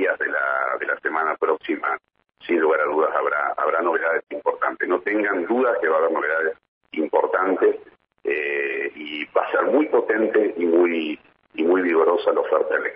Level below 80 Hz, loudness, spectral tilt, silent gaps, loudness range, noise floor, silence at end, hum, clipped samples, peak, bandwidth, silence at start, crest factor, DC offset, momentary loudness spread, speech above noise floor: -72 dBFS; -21 LUFS; -8 dB/octave; 6.68-6.81 s; 2 LU; -44 dBFS; 0 s; none; under 0.1%; -6 dBFS; 5 kHz; 0 s; 16 dB; under 0.1%; 8 LU; 22 dB